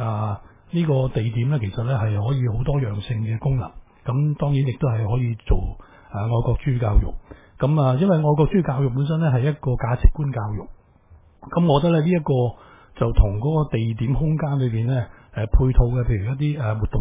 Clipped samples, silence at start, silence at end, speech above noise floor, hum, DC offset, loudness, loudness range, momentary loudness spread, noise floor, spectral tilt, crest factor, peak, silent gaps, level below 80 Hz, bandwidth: under 0.1%; 0 s; 0 s; 31 dB; none; under 0.1%; -22 LUFS; 3 LU; 8 LU; -51 dBFS; -12.5 dB/octave; 20 dB; 0 dBFS; none; -28 dBFS; 3.8 kHz